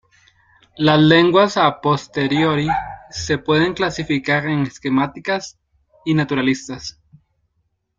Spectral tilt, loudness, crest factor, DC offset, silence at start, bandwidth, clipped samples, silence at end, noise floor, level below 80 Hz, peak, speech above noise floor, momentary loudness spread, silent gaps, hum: -5.5 dB/octave; -18 LUFS; 18 dB; under 0.1%; 0.75 s; 7.6 kHz; under 0.1%; 1.1 s; -69 dBFS; -50 dBFS; 0 dBFS; 52 dB; 16 LU; none; none